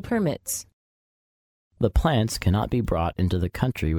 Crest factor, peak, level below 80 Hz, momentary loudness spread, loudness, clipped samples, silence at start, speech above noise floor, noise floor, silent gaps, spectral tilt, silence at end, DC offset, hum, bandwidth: 18 dB; -6 dBFS; -34 dBFS; 6 LU; -25 LUFS; under 0.1%; 0 s; over 67 dB; under -90 dBFS; 0.73-1.71 s; -6 dB/octave; 0 s; under 0.1%; none; 18 kHz